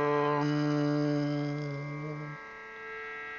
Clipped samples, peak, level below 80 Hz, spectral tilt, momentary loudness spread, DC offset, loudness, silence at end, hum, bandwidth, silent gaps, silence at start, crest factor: under 0.1%; -16 dBFS; -68 dBFS; -7.5 dB/octave; 13 LU; under 0.1%; -32 LUFS; 0 s; none; 7 kHz; none; 0 s; 16 dB